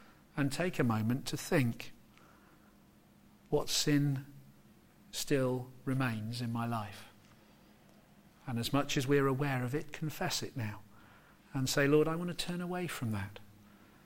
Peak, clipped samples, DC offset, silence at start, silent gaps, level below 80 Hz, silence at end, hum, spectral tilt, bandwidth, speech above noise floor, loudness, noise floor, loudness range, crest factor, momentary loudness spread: -16 dBFS; under 0.1%; under 0.1%; 0 s; none; -58 dBFS; 0.55 s; none; -5 dB/octave; 16.5 kHz; 29 dB; -34 LUFS; -62 dBFS; 3 LU; 20 dB; 14 LU